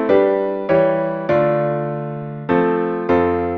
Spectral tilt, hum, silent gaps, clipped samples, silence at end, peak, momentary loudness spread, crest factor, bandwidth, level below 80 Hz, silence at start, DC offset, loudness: -9.5 dB/octave; none; none; under 0.1%; 0 s; -2 dBFS; 9 LU; 16 dB; 5.6 kHz; -52 dBFS; 0 s; under 0.1%; -18 LUFS